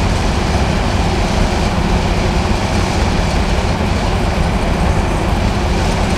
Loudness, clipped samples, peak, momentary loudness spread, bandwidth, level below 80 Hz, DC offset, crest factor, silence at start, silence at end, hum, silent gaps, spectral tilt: -16 LUFS; under 0.1%; -2 dBFS; 1 LU; 14 kHz; -18 dBFS; under 0.1%; 12 dB; 0 s; 0 s; none; none; -5.5 dB/octave